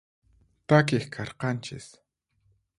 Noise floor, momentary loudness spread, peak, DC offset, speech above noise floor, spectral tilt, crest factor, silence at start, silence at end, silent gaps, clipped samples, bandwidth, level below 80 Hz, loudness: -70 dBFS; 21 LU; -6 dBFS; under 0.1%; 44 dB; -6.5 dB/octave; 24 dB; 0.7 s; 0.95 s; none; under 0.1%; 11.5 kHz; -62 dBFS; -26 LUFS